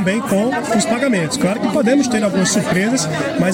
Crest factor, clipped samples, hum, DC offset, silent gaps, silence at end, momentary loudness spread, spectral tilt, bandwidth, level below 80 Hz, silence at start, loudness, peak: 12 dB; under 0.1%; none; under 0.1%; none; 0 s; 3 LU; -4.5 dB/octave; 17 kHz; -52 dBFS; 0 s; -16 LUFS; -4 dBFS